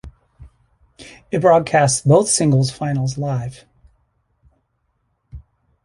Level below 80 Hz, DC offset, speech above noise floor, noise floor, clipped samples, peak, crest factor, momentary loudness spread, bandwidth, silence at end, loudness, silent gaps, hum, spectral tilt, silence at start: -48 dBFS; under 0.1%; 52 dB; -68 dBFS; under 0.1%; -2 dBFS; 18 dB; 11 LU; 11.5 kHz; 0.45 s; -16 LUFS; none; none; -5 dB/octave; 0.05 s